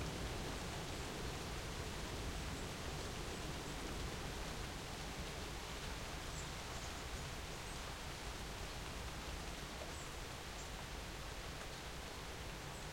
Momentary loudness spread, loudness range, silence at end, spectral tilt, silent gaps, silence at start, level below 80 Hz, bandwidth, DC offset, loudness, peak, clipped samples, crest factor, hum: 3 LU; 2 LU; 0 s; -3.5 dB/octave; none; 0 s; -52 dBFS; 16 kHz; under 0.1%; -46 LUFS; -32 dBFS; under 0.1%; 14 dB; none